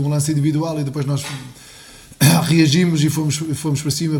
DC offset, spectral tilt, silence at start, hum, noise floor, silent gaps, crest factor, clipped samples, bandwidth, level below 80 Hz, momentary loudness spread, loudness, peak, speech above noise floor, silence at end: under 0.1%; -5 dB/octave; 0 s; none; -41 dBFS; none; 18 dB; under 0.1%; 18.5 kHz; -50 dBFS; 10 LU; -17 LUFS; 0 dBFS; 24 dB; 0 s